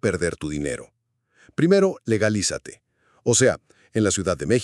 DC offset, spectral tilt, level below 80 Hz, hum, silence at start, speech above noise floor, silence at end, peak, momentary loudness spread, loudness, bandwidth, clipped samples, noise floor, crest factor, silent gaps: under 0.1%; -4.5 dB/octave; -50 dBFS; none; 0.05 s; 41 dB; 0 s; -4 dBFS; 15 LU; -22 LUFS; 12.5 kHz; under 0.1%; -63 dBFS; 18 dB; none